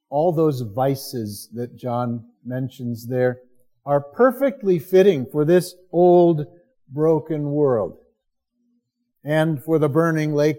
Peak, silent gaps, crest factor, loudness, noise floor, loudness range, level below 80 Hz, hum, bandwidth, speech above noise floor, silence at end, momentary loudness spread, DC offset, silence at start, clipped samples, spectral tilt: -4 dBFS; none; 16 dB; -20 LUFS; -74 dBFS; 7 LU; -66 dBFS; none; 17 kHz; 54 dB; 0 s; 15 LU; under 0.1%; 0.1 s; under 0.1%; -7.5 dB/octave